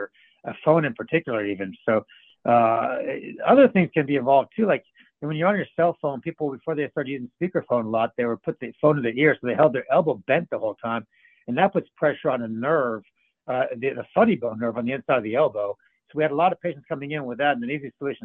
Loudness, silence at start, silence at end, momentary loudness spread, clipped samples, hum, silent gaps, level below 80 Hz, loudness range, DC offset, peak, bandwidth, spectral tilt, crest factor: -23 LUFS; 0 s; 0.1 s; 11 LU; under 0.1%; none; none; -68 dBFS; 5 LU; under 0.1%; -4 dBFS; 4.2 kHz; -10 dB/octave; 20 dB